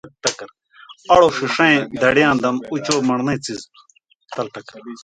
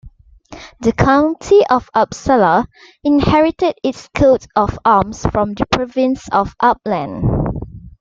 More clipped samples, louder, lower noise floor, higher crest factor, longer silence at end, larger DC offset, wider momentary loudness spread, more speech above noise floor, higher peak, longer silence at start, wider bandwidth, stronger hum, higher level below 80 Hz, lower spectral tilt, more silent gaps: neither; about the same, -17 LUFS vs -15 LUFS; first, -45 dBFS vs -40 dBFS; about the same, 20 dB vs 16 dB; about the same, 0.05 s vs 0.1 s; neither; first, 19 LU vs 8 LU; about the same, 27 dB vs 26 dB; about the same, 0 dBFS vs 0 dBFS; about the same, 0.05 s vs 0.05 s; first, 9.6 kHz vs 7.6 kHz; neither; second, -52 dBFS vs -34 dBFS; second, -4 dB/octave vs -6.5 dB/octave; first, 4.15-4.20 s vs none